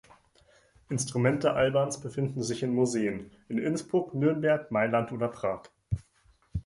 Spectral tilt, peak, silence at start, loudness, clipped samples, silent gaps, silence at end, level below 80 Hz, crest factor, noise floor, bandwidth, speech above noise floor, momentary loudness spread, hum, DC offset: -6 dB/octave; -12 dBFS; 0.9 s; -29 LUFS; under 0.1%; none; 0.05 s; -52 dBFS; 18 dB; -65 dBFS; 11.5 kHz; 37 dB; 11 LU; none; under 0.1%